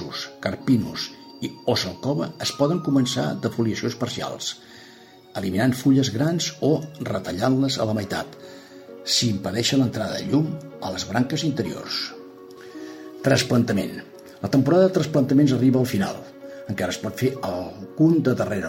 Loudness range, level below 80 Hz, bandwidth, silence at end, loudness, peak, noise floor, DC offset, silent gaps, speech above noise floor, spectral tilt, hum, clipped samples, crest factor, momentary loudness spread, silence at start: 4 LU; -58 dBFS; 16.5 kHz; 0 s; -23 LUFS; -6 dBFS; -47 dBFS; under 0.1%; none; 25 dB; -5.5 dB/octave; none; under 0.1%; 18 dB; 18 LU; 0 s